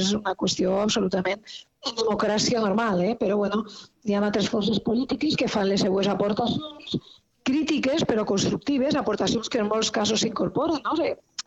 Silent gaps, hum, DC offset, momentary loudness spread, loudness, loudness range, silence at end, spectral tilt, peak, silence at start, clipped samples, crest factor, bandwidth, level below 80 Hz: none; none; under 0.1%; 8 LU; -25 LUFS; 1 LU; 0.05 s; -4.5 dB/octave; -10 dBFS; 0 s; under 0.1%; 14 dB; 8.2 kHz; -56 dBFS